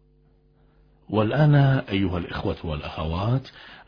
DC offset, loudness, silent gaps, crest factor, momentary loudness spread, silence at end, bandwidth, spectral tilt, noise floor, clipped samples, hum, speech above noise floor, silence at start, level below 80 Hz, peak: under 0.1%; -23 LUFS; none; 18 dB; 12 LU; 0.05 s; 5.2 kHz; -9.5 dB/octave; -59 dBFS; under 0.1%; none; 36 dB; 1.1 s; -42 dBFS; -6 dBFS